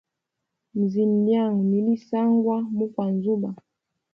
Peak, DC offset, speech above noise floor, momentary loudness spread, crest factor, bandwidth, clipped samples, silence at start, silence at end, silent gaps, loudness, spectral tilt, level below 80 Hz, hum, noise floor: -10 dBFS; under 0.1%; 60 dB; 7 LU; 14 dB; 5.6 kHz; under 0.1%; 0.75 s; 0.6 s; none; -23 LUFS; -10.5 dB/octave; -72 dBFS; none; -82 dBFS